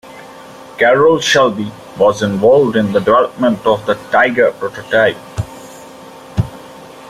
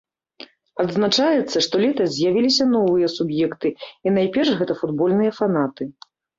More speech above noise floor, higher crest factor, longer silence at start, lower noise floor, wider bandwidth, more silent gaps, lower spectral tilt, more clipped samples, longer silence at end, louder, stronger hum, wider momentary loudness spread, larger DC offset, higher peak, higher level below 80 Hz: about the same, 23 dB vs 26 dB; about the same, 14 dB vs 16 dB; second, 0.05 s vs 0.4 s; second, -35 dBFS vs -45 dBFS; first, 14.5 kHz vs 7.8 kHz; neither; about the same, -5 dB/octave vs -5 dB/octave; neither; second, 0 s vs 0.5 s; first, -13 LUFS vs -20 LUFS; neither; first, 17 LU vs 9 LU; neither; first, 0 dBFS vs -6 dBFS; first, -44 dBFS vs -62 dBFS